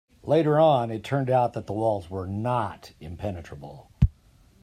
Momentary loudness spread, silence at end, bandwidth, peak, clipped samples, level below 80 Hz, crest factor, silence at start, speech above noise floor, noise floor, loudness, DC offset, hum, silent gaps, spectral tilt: 22 LU; 0.55 s; 13 kHz; -6 dBFS; under 0.1%; -40 dBFS; 20 dB; 0.25 s; 32 dB; -57 dBFS; -25 LUFS; under 0.1%; none; none; -8 dB/octave